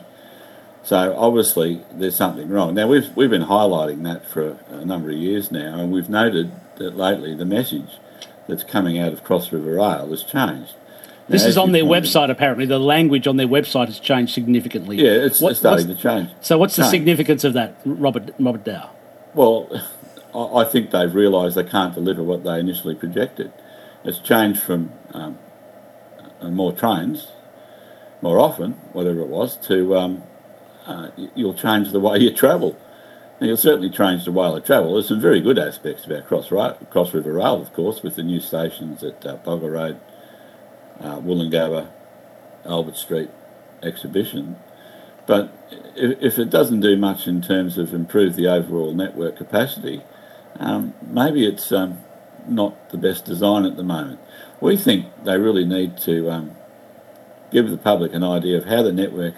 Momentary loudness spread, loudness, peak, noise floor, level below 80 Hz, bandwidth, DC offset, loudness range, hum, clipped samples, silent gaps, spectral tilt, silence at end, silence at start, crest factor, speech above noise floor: 15 LU; -19 LUFS; 0 dBFS; -44 dBFS; -66 dBFS; 16 kHz; under 0.1%; 9 LU; none; under 0.1%; none; -5 dB/octave; 0 s; 0 s; 20 dB; 26 dB